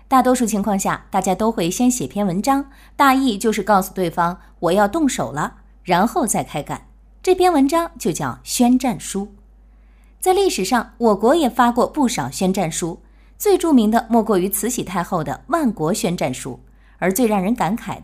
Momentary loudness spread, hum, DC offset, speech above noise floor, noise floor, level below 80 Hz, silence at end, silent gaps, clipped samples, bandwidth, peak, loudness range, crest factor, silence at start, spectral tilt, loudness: 10 LU; none; under 0.1%; 29 dB; -47 dBFS; -44 dBFS; 0 s; none; under 0.1%; 16 kHz; 0 dBFS; 2 LU; 18 dB; 0.1 s; -4.5 dB/octave; -19 LUFS